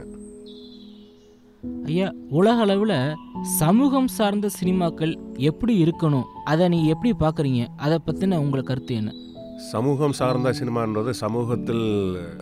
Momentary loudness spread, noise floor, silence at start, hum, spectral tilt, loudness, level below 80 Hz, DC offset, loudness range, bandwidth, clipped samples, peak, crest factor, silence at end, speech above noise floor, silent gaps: 15 LU; -51 dBFS; 0 s; none; -6.5 dB/octave; -22 LUFS; -48 dBFS; under 0.1%; 3 LU; 15.5 kHz; under 0.1%; -8 dBFS; 14 dB; 0 s; 29 dB; none